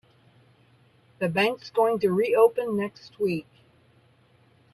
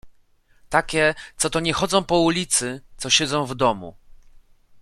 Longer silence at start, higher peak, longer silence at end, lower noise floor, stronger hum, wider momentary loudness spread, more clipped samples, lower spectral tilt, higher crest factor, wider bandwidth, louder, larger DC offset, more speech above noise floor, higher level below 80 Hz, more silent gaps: first, 1.2 s vs 0.05 s; second, -8 dBFS vs -2 dBFS; first, 1.35 s vs 0.45 s; about the same, -60 dBFS vs -58 dBFS; neither; about the same, 10 LU vs 10 LU; neither; first, -6 dB/octave vs -3 dB/octave; about the same, 20 dB vs 22 dB; second, 12.5 kHz vs 14.5 kHz; second, -25 LUFS vs -21 LUFS; neither; about the same, 36 dB vs 36 dB; second, -70 dBFS vs -46 dBFS; neither